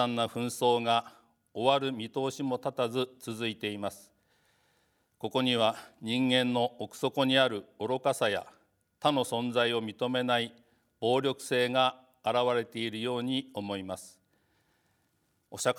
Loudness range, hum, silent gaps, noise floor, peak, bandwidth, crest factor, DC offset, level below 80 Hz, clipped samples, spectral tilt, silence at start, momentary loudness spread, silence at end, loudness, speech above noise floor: 5 LU; none; none; -74 dBFS; -10 dBFS; 18 kHz; 22 dB; under 0.1%; -80 dBFS; under 0.1%; -4.5 dB/octave; 0 s; 10 LU; 0 s; -30 LUFS; 44 dB